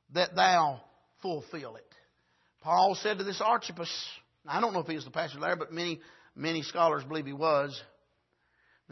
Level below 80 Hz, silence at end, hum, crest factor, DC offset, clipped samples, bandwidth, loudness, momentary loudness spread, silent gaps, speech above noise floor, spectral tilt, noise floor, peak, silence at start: -78 dBFS; 1.05 s; none; 20 dB; under 0.1%; under 0.1%; 6.2 kHz; -30 LUFS; 17 LU; none; 44 dB; -4 dB/octave; -74 dBFS; -12 dBFS; 0.1 s